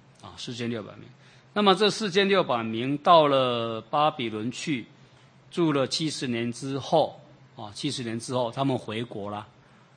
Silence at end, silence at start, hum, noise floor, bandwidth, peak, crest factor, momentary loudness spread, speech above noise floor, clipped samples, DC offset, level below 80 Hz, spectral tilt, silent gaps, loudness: 0.5 s; 0.25 s; none; -55 dBFS; 9.8 kHz; -4 dBFS; 22 dB; 15 LU; 29 dB; under 0.1%; under 0.1%; -70 dBFS; -5 dB/octave; none; -26 LUFS